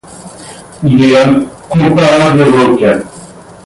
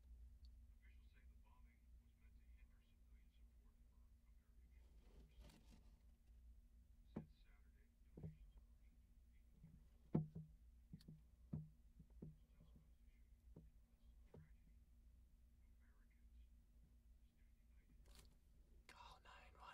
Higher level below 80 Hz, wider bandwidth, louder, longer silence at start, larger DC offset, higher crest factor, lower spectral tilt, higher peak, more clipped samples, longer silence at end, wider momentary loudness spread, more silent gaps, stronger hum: first, -40 dBFS vs -68 dBFS; first, 11.5 kHz vs 9.4 kHz; first, -9 LUFS vs -58 LUFS; about the same, 0.1 s vs 0 s; neither; second, 10 dB vs 34 dB; about the same, -6.5 dB/octave vs -7.5 dB/octave; first, 0 dBFS vs -28 dBFS; neither; first, 0.35 s vs 0 s; first, 22 LU vs 19 LU; neither; neither